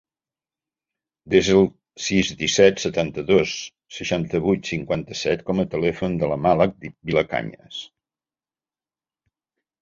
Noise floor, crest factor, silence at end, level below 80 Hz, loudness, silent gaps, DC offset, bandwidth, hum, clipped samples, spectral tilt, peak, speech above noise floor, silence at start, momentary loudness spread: under -90 dBFS; 22 dB; 1.95 s; -50 dBFS; -21 LUFS; none; under 0.1%; 7.8 kHz; none; under 0.1%; -5 dB/octave; -2 dBFS; over 69 dB; 1.25 s; 14 LU